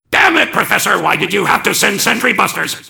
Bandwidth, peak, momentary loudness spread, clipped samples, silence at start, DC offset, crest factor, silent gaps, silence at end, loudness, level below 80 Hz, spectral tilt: over 20 kHz; 0 dBFS; 3 LU; 0.4%; 0.1 s; under 0.1%; 14 dB; none; 0 s; -12 LUFS; -50 dBFS; -2 dB/octave